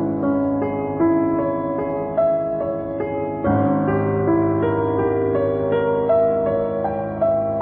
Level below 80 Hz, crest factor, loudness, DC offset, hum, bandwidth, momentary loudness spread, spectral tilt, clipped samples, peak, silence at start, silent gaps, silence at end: -46 dBFS; 12 dB; -20 LUFS; under 0.1%; none; 4 kHz; 6 LU; -13.5 dB/octave; under 0.1%; -8 dBFS; 0 s; none; 0 s